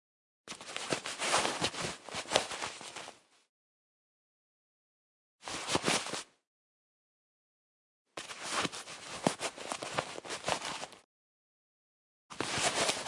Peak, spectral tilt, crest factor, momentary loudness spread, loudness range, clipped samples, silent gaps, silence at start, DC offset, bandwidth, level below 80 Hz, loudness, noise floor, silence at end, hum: -6 dBFS; -2 dB/octave; 34 dB; 16 LU; 5 LU; under 0.1%; 3.49-5.39 s, 6.47-8.05 s, 11.05-12.29 s; 0.45 s; under 0.1%; 11.5 kHz; -72 dBFS; -35 LUFS; under -90 dBFS; 0 s; none